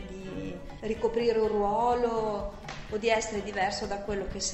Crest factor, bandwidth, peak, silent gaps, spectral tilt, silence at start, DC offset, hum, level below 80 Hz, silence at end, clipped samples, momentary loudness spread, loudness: 18 dB; 8.4 kHz; -12 dBFS; none; -4 dB/octave; 0 s; under 0.1%; none; -46 dBFS; 0 s; under 0.1%; 12 LU; -30 LUFS